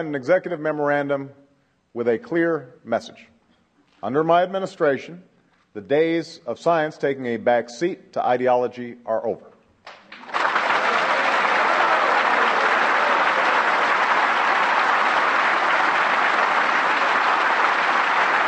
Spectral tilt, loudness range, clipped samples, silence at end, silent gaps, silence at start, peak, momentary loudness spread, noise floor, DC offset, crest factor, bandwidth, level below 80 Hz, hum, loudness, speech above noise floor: -4 dB/octave; 7 LU; under 0.1%; 0 s; none; 0 s; -4 dBFS; 9 LU; -62 dBFS; under 0.1%; 16 dB; 9.2 kHz; -76 dBFS; none; -20 LUFS; 40 dB